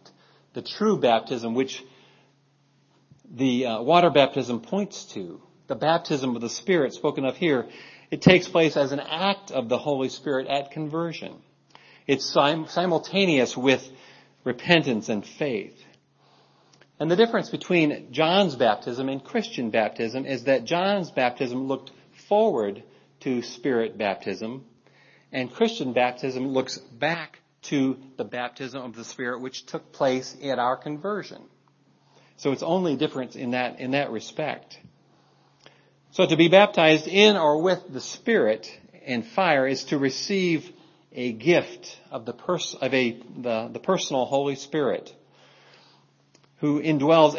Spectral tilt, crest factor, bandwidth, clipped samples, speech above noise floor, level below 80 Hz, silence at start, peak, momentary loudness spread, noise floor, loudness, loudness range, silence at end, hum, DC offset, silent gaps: -5 dB/octave; 24 dB; 7.4 kHz; under 0.1%; 40 dB; -68 dBFS; 0.55 s; 0 dBFS; 15 LU; -63 dBFS; -24 LUFS; 8 LU; 0 s; none; under 0.1%; none